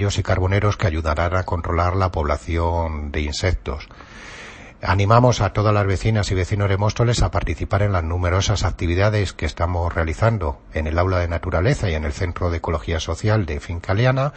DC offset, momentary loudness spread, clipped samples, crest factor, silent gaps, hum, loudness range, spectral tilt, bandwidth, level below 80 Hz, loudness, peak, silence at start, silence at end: under 0.1%; 8 LU; under 0.1%; 20 dB; none; none; 3 LU; -6 dB/octave; 8.6 kHz; -30 dBFS; -21 LUFS; 0 dBFS; 0 s; 0 s